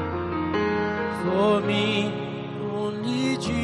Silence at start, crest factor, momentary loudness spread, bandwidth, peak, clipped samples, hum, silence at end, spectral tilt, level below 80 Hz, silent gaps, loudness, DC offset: 0 s; 16 dB; 9 LU; 11.5 kHz; -8 dBFS; under 0.1%; none; 0 s; -6 dB/octave; -48 dBFS; none; -25 LUFS; under 0.1%